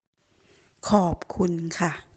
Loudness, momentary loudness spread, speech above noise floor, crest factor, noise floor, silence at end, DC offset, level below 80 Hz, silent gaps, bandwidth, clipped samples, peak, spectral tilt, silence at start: -25 LUFS; 6 LU; 36 dB; 22 dB; -61 dBFS; 0.15 s; under 0.1%; -50 dBFS; none; 8.8 kHz; under 0.1%; -4 dBFS; -6 dB/octave; 0.85 s